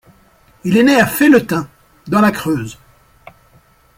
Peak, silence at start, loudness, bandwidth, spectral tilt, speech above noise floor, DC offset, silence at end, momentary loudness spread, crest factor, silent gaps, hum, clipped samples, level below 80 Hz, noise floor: 0 dBFS; 0.65 s; -14 LUFS; 16.5 kHz; -5.5 dB/octave; 38 dB; under 0.1%; 1.25 s; 15 LU; 16 dB; none; none; under 0.1%; -48 dBFS; -51 dBFS